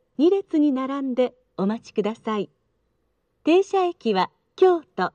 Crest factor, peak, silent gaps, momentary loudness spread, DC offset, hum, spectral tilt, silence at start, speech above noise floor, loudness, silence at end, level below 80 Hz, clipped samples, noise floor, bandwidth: 16 dB; -6 dBFS; none; 9 LU; under 0.1%; none; -6.5 dB/octave; 0.2 s; 50 dB; -23 LUFS; 0.05 s; -72 dBFS; under 0.1%; -71 dBFS; 8.4 kHz